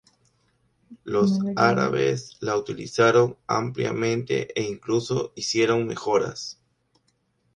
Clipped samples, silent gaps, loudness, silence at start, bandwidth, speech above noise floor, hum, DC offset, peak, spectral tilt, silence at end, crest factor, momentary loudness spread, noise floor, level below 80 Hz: under 0.1%; none; -24 LUFS; 0.9 s; 10.5 kHz; 46 dB; none; under 0.1%; -2 dBFS; -5.5 dB/octave; 1.05 s; 22 dB; 9 LU; -69 dBFS; -62 dBFS